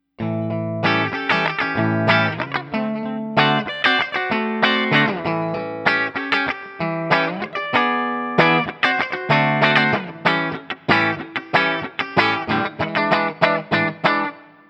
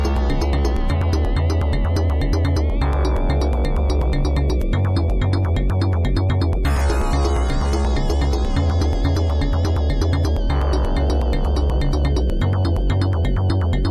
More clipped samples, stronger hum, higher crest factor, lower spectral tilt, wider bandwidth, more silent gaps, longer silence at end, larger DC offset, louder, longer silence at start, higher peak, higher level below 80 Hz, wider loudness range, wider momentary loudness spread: neither; neither; first, 20 dB vs 12 dB; about the same, -6.5 dB/octave vs -7 dB/octave; second, 8.8 kHz vs 12 kHz; neither; first, 0.25 s vs 0 s; neither; about the same, -19 LUFS vs -20 LUFS; first, 0.2 s vs 0 s; first, 0 dBFS vs -6 dBFS; second, -58 dBFS vs -20 dBFS; about the same, 2 LU vs 0 LU; first, 8 LU vs 1 LU